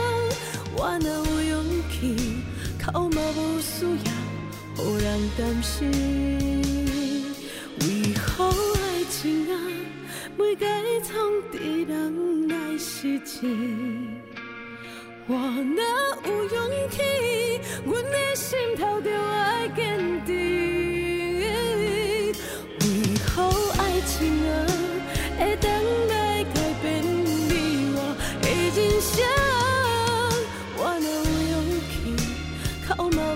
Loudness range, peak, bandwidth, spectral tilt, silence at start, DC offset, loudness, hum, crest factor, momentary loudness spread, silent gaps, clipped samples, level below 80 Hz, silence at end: 4 LU; -10 dBFS; 16 kHz; -4.5 dB/octave; 0 s; under 0.1%; -25 LUFS; none; 16 dB; 8 LU; none; under 0.1%; -38 dBFS; 0 s